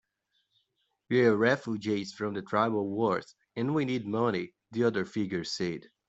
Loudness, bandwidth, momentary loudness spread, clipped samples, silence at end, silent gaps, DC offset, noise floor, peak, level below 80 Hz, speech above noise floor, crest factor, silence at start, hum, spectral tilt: -30 LUFS; 8.2 kHz; 10 LU; under 0.1%; 0.3 s; none; under 0.1%; -78 dBFS; -10 dBFS; -70 dBFS; 49 dB; 20 dB; 1.1 s; none; -6 dB/octave